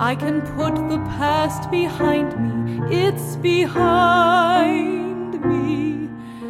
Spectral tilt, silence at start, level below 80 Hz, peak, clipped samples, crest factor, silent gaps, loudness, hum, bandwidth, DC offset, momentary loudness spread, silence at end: -6.5 dB/octave; 0 s; -44 dBFS; -4 dBFS; under 0.1%; 16 dB; none; -19 LUFS; none; 15.5 kHz; under 0.1%; 9 LU; 0 s